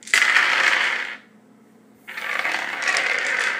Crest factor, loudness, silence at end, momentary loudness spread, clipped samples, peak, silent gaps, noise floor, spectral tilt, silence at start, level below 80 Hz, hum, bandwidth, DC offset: 22 dB; -19 LUFS; 0 s; 15 LU; under 0.1%; 0 dBFS; none; -52 dBFS; 1 dB/octave; 0.05 s; -80 dBFS; none; 15.5 kHz; under 0.1%